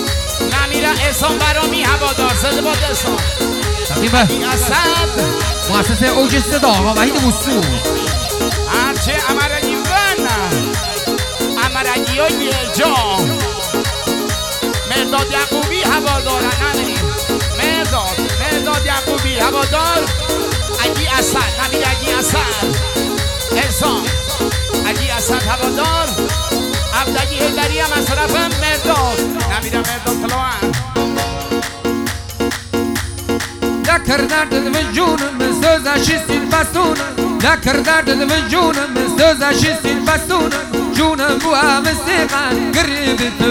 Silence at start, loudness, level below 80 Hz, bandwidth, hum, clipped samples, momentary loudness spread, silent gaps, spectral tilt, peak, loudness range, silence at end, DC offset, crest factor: 0 s; -15 LUFS; -26 dBFS; over 20 kHz; none; under 0.1%; 5 LU; none; -3.5 dB/octave; 0 dBFS; 3 LU; 0 s; under 0.1%; 16 dB